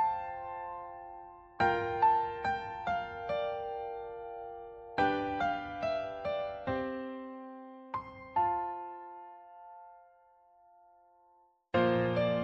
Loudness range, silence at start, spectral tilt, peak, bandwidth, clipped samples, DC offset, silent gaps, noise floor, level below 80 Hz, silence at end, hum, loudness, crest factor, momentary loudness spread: 6 LU; 0 s; -4 dB/octave; -16 dBFS; 8 kHz; under 0.1%; under 0.1%; none; -67 dBFS; -64 dBFS; 0 s; none; -34 LUFS; 20 dB; 19 LU